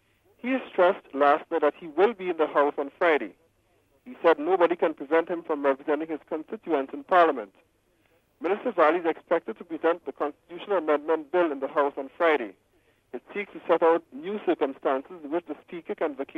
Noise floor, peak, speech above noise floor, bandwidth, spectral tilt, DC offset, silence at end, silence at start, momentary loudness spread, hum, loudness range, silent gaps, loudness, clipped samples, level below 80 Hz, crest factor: -66 dBFS; -8 dBFS; 40 dB; 5.6 kHz; -6.5 dB/octave; under 0.1%; 0.15 s; 0.45 s; 13 LU; none; 3 LU; none; -26 LUFS; under 0.1%; -74 dBFS; 18 dB